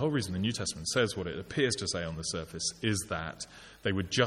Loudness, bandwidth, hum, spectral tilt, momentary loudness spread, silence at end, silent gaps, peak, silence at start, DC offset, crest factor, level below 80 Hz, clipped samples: -32 LUFS; 15 kHz; none; -4 dB/octave; 7 LU; 0 s; none; -10 dBFS; 0 s; under 0.1%; 22 dB; -56 dBFS; under 0.1%